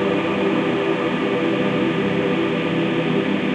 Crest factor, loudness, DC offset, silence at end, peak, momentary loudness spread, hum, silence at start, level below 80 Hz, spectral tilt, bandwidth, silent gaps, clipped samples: 12 dB; -20 LUFS; under 0.1%; 0 s; -8 dBFS; 1 LU; none; 0 s; -58 dBFS; -7 dB/octave; 9.6 kHz; none; under 0.1%